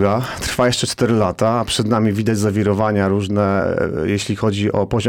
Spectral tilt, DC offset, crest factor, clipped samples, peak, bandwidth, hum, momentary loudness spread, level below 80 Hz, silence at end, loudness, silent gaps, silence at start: -5.5 dB/octave; 0.3%; 12 dB; under 0.1%; -4 dBFS; 17.5 kHz; none; 3 LU; -42 dBFS; 0 s; -18 LUFS; none; 0 s